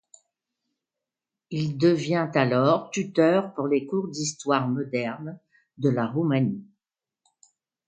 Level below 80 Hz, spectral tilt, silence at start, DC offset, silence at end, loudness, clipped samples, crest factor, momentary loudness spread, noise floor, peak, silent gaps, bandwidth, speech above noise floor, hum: -70 dBFS; -6 dB/octave; 1.5 s; under 0.1%; 1.25 s; -25 LUFS; under 0.1%; 22 dB; 9 LU; -88 dBFS; -6 dBFS; none; 9.4 kHz; 64 dB; none